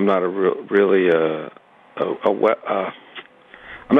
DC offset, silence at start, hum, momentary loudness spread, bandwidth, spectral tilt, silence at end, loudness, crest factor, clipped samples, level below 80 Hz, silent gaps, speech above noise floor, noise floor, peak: under 0.1%; 0 s; none; 22 LU; 4.5 kHz; -8.5 dB/octave; 0 s; -20 LUFS; 16 dB; under 0.1%; -64 dBFS; none; 25 dB; -44 dBFS; -4 dBFS